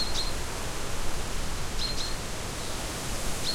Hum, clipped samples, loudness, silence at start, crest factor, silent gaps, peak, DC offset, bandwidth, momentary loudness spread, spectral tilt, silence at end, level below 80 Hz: none; under 0.1%; -33 LUFS; 0 s; 14 dB; none; -16 dBFS; under 0.1%; 16.5 kHz; 4 LU; -2.5 dB/octave; 0 s; -36 dBFS